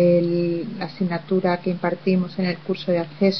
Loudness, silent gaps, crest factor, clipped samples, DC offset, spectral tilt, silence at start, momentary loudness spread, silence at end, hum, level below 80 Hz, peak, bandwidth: -23 LUFS; none; 16 dB; under 0.1%; 0.4%; -8.5 dB/octave; 0 s; 7 LU; 0 s; none; -66 dBFS; -6 dBFS; 6.2 kHz